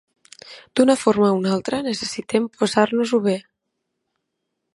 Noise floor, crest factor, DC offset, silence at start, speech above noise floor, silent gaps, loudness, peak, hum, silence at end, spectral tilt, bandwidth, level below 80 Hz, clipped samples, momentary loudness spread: -78 dBFS; 20 dB; under 0.1%; 0.45 s; 58 dB; none; -20 LUFS; -2 dBFS; none; 1.35 s; -5 dB/octave; 11.5 kHz; -64 dBFS; under 0.1%; 9 LU